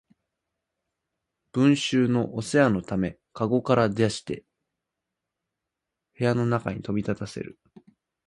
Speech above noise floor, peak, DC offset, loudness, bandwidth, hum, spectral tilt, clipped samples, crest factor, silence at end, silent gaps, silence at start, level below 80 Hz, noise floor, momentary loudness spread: 61 dB; -6 dBFS; under 0.1%; -25 LUFS; 11.5 kHz; none; -6 dB/octave; under 0.1%; 20 dB; 0.75 s; none; 1.55 s; -56 dBFS; -85 dBFS; 12 LU